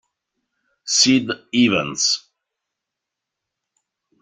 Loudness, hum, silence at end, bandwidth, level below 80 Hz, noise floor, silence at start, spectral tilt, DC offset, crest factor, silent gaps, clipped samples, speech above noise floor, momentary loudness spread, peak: -17 LUFS; none; 2.05 s; 9.6 kHz; -62 dBFS; -83 dBFS; 0.85 s; -2.5 dB/octave; under 0.1%; 22 dB; none; under 0.1%; 65 dB; 9 LU; -2 dBFS